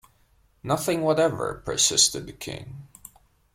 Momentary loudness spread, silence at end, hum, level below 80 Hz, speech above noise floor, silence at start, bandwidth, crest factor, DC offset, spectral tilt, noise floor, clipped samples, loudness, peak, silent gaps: 22 LU; 0.7 s; none; -54 dBFS; 38 dB; 0.65 s; 16.5 kHz; 22 dB; under 0.1%; -2.5 dB/octave; -62 dBFS; under 0.1%; -22 LUFS; -6 dBFS; none